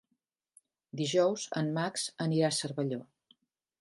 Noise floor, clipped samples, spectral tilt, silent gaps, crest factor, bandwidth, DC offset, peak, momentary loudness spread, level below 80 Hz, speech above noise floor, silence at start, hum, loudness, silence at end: -82 dBFS; under 0.1%; -4.5 dB/octave; none; 18 dB; 11.5 kHz; under 0.1%; -16 dBFS; 8 LU; -78 dBFS; 51 dB; 0.95 s; none; -32 LUFS; 0.75 s